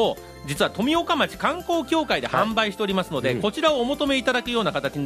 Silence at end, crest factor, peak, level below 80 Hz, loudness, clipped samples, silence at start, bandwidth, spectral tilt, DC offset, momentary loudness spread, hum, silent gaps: 0 s; 18 dB; -4 dBFS; -50 dBFS; -23 LUFS; under 0.1%; 0 s; 15.5 kHz; -4.5 dB/octave; under 0.1%; 4 LU; none; none